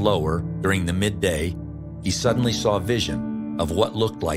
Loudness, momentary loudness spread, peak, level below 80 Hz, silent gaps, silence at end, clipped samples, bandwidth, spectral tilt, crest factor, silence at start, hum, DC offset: -23 LUFS; 8 LU; -6 dBFS; -42 dBFS; none; 0 s; under 0.1%; 16 kHz; -5 dB/octave; 18 dB; 0 s; none; under 0.1%